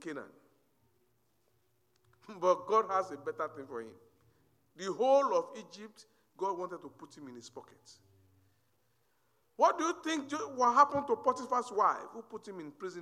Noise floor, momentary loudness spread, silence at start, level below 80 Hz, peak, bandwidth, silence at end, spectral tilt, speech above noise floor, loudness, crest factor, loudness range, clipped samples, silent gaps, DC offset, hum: -76 dBFS; 22 LU; 0 s; -80 dBFS; -12 dBFS; 12 kHz; 0 s; -4 dB/octave; 43 dB; -32 LUFS; 24 dB; 14 LU; under 0.1%; none; under 0.1%; none